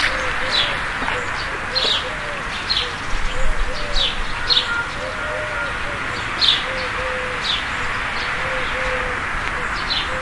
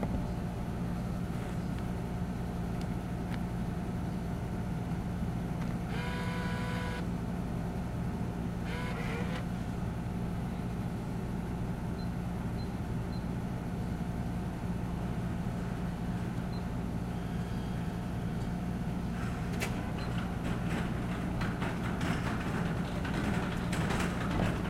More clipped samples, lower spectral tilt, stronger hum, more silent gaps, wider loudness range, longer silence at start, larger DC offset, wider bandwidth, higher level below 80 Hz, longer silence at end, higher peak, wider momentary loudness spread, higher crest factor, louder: neither; second, -2.5 dB/octave vs -7 dB/octave; neither; neither; about the same, 2 LU vs 3 LU; about the same, 0 s vs 0 s; neither; second, 11.5 kHz vs 15.5 kHz; first, -30 dBFS vs -42 dBFS; about the same, 0 s vs 0 s; first, 0 dBFS vs -18 dBFS; first, 8 LU vs 4 LU; about the same, 20 dB vs 18 dB; first, -20 LUFS vs -36 LUFS